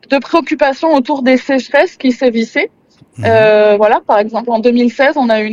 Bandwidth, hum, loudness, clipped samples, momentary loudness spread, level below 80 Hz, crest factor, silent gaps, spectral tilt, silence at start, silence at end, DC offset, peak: 7.6 kHz; none; -11 LUFS; under 0.1%; 6 LU; -54 dBFS; 12 dB; none; -6 dB/octave; 0.1 s; 0 s; under 0.1%; 0 dBFS